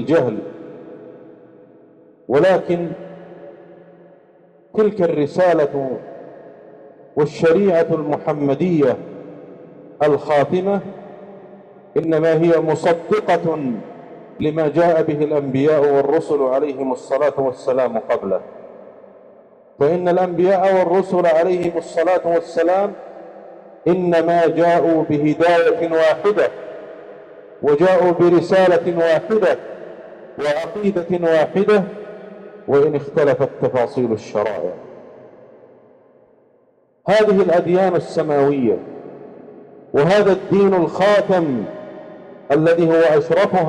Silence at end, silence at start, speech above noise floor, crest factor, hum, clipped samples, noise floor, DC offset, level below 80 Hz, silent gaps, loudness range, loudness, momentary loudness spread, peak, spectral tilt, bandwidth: 0 s; 0 s; 41 dB; 12 dB; none; under 0.1%; -57 dBFS; under 0.1%; -58 dBFS; none; 5 LU; -17 LUFS; 21 LU; -6 dBFS; -7.5 dB/octave; 10.5 kHz